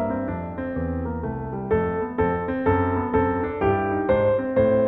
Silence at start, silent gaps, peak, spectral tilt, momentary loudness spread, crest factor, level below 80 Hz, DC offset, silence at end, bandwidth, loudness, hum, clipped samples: 0 s; none; -8 dBFS; -11 dB/octave; 9 LU; 16 dB; -40 dBFS; under 0.1%; 0 s; 4 kHz; -24 LUFS; none; under 0.1%